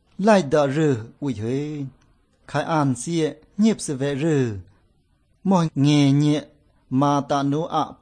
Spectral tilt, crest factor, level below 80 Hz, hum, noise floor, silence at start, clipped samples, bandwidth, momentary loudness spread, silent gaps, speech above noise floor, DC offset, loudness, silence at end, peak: -6.5 dB/octave; 16 dB; -58 dBFS; none; -63 dBFS; 0.2 s; under 0.1%; 9.8 kHz; 11 LU; none; 42 dB; under 0.1%; -21 LUFS; 0.1 s; -4 dBFS